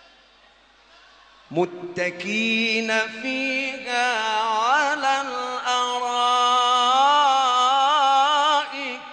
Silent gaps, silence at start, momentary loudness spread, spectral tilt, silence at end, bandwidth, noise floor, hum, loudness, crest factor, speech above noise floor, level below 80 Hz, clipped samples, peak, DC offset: none; 1.5 s; 9 LU; -2 dB/octave; 0 s; 9.6 kHz; -55 dBFS; none; -20 LUFS; 14 dB; 31 dB; -70 dBFS; under 0.1%; -8 dBFS; under 0.1%